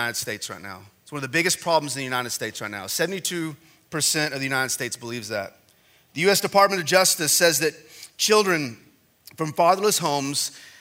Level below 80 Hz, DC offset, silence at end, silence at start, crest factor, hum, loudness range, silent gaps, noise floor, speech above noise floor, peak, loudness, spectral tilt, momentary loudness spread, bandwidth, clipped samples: -70 dBFS; under 0.1%; 0.1 s; 0 s; 22 dB; none; 6 LU; none; -59 dBFS; 35 dB; -2 dBFS; -22 LUFS; -2.5 dB/octave; 16 LU; 16 kHz; under 0.1%